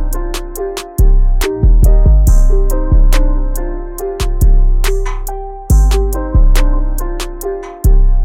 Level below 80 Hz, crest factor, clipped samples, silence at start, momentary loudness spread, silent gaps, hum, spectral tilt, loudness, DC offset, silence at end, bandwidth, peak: -10 dBFS; 8 dB; under 0.1%; 0 s; 12 LU; none; none; -6 dB/octave; -15 LUFS; under 0.1%; 0 s; 16 kHz; 0 dBFS